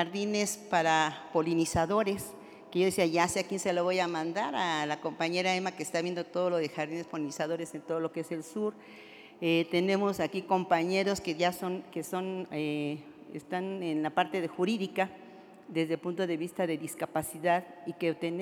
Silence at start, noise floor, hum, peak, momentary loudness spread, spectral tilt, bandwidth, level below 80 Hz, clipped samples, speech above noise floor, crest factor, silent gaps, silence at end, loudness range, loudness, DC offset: 0 s; -51 dBFS; none; -12 dBFS; 9 LU; -4.5 dB/octave; 18.5 kHz; -66 dBFS; under 0.1%; 20 dB; 20 dB; none; 0 s; 4 LU; -31 LUFS; under 0.1%